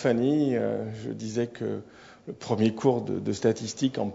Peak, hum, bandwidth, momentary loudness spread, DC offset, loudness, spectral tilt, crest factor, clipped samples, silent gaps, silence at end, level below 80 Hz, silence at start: -10 dBFS; none; 8 kHz; 13 LU; under 0.1%; -28 LUFS; -6.5 dB/octave; 18 dB; under 0.1%; none; 0 s; -66 dBFS; 0 s